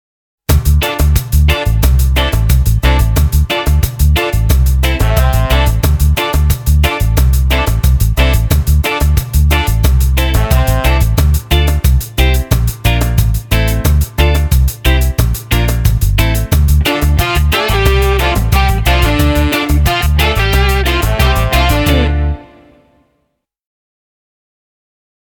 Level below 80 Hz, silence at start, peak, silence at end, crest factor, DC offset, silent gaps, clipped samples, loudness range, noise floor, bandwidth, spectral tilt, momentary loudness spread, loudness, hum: -12 dBFS; 0.5 s; 0 dBFS; 2.8 s; 10 dB; under 0.1%; none; under 0.1%; 1 LU; -66 dBFS; 19.5 kHz; -5 dB/octave; 2 LU; -12 LUFS; none